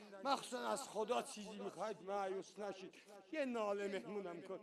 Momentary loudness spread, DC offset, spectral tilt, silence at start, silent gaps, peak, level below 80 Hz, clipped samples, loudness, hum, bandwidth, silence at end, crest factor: 8 LU; under 0.1%; -3.5 dB/octave; 0 s; none; -22 dBFS; -88 dBFS; under 0.1%; -44 LUFS; none; 13 kHz; 0 s; 22 dB